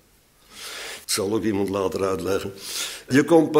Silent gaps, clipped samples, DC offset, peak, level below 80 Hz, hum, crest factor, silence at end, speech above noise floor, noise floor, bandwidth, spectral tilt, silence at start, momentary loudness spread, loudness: none; under 0.1%; under 0.1%; -4 dBFS; -58 dBFS; none; 18 dB; 0 s; 35 dB; -57 dBFS; 16 kHz; -4.5 dB/octave; 0.55 s; 14 LU; -24 LUFS